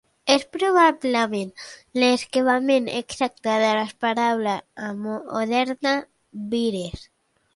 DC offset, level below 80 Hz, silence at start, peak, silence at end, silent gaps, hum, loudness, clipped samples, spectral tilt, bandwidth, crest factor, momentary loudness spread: under 0.1%; -56 dBFS; 0.25 s; -4 dBFS; 0.5 s; none; none; -22 LUFS; under 0.1%; -4 dB/octave; 11.5 kHz; 18 dB; 13 LU